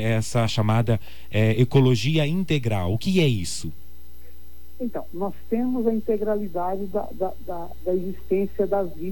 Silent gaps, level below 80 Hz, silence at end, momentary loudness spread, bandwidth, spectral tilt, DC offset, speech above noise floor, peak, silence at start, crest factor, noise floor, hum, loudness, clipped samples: none; -46 dBFS; 0 s; 12 LU; 17.5 kHz; -6.5 dB/octave; 3%; 24 dB; -8 dBFS; 0 s; 16 dB; -48 dBFS; none; -24 LUFS; under 0.1%